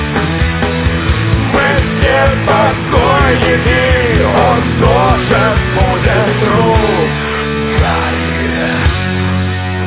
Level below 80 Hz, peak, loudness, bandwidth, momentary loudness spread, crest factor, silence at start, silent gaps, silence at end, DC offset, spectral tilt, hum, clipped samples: -20 dBFS; 0 dBFS; -11 LUFS; 4 kHz; 5 LU; 12 dB; 0 s; none; 0 s; 0.3%; -10.5 dB/octave; none; 0.1%